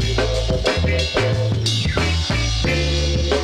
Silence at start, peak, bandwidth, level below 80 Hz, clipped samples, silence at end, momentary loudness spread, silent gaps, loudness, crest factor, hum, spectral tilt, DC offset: 0 s; -2 dBFS; 12.5 kHz; -24 dBFS; under 0.1%; 0 s; 1 LU; none; -19 LUFS; 16 dB; none; -4.5 dB/octave; under 0.1%